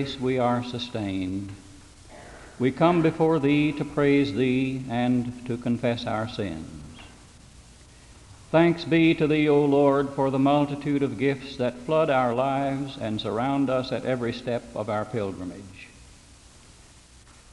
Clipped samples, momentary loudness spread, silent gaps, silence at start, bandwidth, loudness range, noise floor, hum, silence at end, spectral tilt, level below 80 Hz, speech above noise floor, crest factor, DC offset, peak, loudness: under 0.1%; 14 LU; none; 0 s; 11.5 kHz; 8 LU; -51 dBFS; none; 1.5 s; -7 dB/octave; -54 dBFS; 27 dB; 18 dB; under 0.1%; -6 dBFS; -24 LUFS